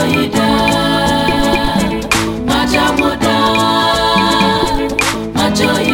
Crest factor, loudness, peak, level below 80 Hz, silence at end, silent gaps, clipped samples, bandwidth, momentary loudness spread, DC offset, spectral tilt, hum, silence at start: 12 dB; -13 LUFS; 0 dBFS; -30 dBFS; 0 s; none; under 0.1%; 19 kHz; 3 LU; under 0.1%; -4 dB/octave; none; 0 s